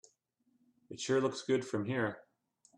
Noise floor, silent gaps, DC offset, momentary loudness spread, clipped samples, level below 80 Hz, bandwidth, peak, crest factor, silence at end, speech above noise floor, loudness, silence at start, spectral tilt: -77 dBFS; none; under 0.1%; 15 LU; under 0.1%; -78 dBFS; 10.5 kHz; -20 dBFS; 16 dB; 0.55 s; 43 dB; -35 LUFS; 0.9 s; -5 dB/octave